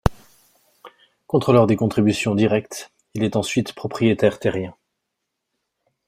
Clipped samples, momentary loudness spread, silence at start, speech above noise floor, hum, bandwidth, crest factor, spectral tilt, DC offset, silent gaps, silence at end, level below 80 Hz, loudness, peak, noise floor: under 0.1%; 15 LU; 0.05 s; 60 dB; none; 15.5 kHz; 20 dB; -6.5 dB/octave; under 0.1%; none; 1.35 s; -42 dBFS; -20 LUFS; -2 dBFS; -79 dBFS